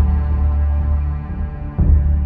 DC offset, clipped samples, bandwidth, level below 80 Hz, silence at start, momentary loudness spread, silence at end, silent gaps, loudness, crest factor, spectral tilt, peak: under 0.1%; under 0.1%; 2.7 kHz; -16 dBFS; 0 s; 10 LU; 0 s; none; -19 LUFS; 12 dB; -12 dB/octave; -4 dBFS